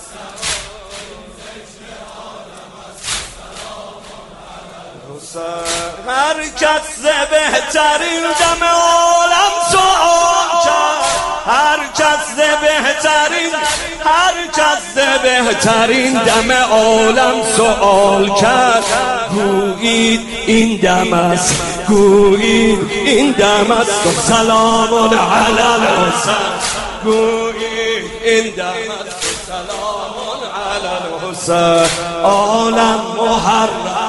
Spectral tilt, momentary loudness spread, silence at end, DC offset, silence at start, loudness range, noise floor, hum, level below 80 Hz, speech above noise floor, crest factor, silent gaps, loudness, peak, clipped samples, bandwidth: -3 dB/octave; 16 LU; 0 s; under 0.1%; 0 s; 13 LU; -34 dBFS; none; -38 dBFS; 22 dB; 14 dB; none; -13 LUFS; 0 dBFS; under 0.1%; 11.5 kHz